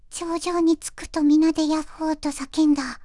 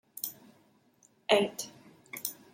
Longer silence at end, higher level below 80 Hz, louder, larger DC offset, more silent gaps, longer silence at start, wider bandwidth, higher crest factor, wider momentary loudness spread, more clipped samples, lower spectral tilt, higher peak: second, 0 s vs 0.2 s; first, -48 dBFS vs -78 dBFS; first, -22 LUFS vs -32 LUFS; neither; neither; about the same, 0.1 s vs 0.15 s; second, 12 kHz vs 16.5 kHz; second, 12 dB vs 28 dB; second, 9 LU vs 17 LU; neither; about the same, -3.5 dB/octave vs -2.5 dB/octave; about the same, -10 dBFS vs -8 dBFS